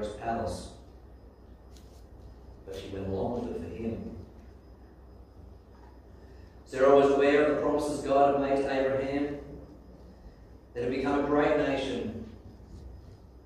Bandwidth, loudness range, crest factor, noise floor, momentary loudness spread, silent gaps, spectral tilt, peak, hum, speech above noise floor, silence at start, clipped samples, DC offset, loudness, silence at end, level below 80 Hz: 12 kHz; 14 LU; 22 dB; -52 dBFS; 25 LU; none; -6 dB/octave; -10 dBFS; none; 24 dB; 0 s; under 0.1%; under 0.1%; -28 LUFS; 0.05 s; -50 dBFS